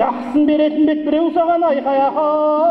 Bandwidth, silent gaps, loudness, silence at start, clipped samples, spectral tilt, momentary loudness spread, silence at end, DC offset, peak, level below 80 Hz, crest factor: 5.2 kHz; none; -16 LUFS; 0 s; under 0.1%; -7.5 dB/octave; 2 LU; 0 s; under 0.1%; -4 dBFS; -54 dBFS; 12 dB